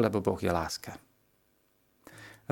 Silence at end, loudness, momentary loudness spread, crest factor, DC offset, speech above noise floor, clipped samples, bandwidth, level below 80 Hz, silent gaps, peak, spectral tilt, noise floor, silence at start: 0.2 s; -31 LUFS; 22 LU; 22 dB; under 0.1%; 40 dB; under 0.1%; 17 kHz; -56 dBFS; none; -12 dBFS; -5.5 dB/octave; -71 dBFS; 0 s